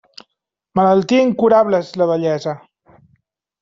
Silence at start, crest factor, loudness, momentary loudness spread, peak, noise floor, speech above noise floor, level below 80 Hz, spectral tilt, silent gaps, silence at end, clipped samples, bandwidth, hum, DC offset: 0.75 s; 16 dB; -16 LUFS; 10 LU; -2 dBFS; -76 dBFS; 61 dB; -58 dBFS; -7 dB/octave; none; 1.05 s; under 0.1%; 7.6 kHz; none; under 0.1%